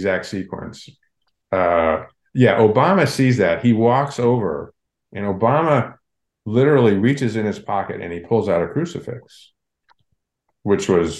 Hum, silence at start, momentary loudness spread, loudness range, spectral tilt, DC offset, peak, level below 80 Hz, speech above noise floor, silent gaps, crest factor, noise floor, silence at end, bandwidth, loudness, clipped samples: none; 0 s; 16 LU; 7 LU; -7 dB/octave; under 0.1%; -2 dBFS; -56 dBFS; 57 dB; none; 18 dB; -74 dBFS; 0 s; 12.5 kHz; -18 LUFS; under 0.1%